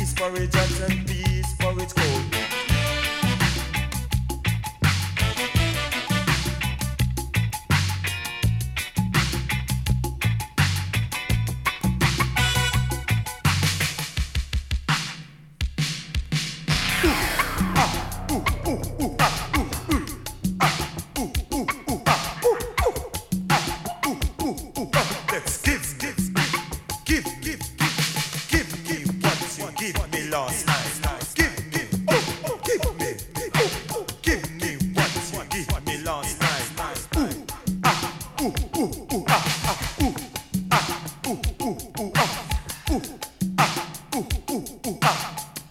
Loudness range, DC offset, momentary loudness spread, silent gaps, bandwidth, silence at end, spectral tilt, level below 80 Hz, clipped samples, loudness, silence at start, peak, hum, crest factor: 2 LU; under 0.1%; 7 LU; none; 17.5 kHz; 0 s; -4 dB/octave; -34 dBFS; under 0.1%; -24 LUFS; 0 s; -4 dBFS; none; 22 dB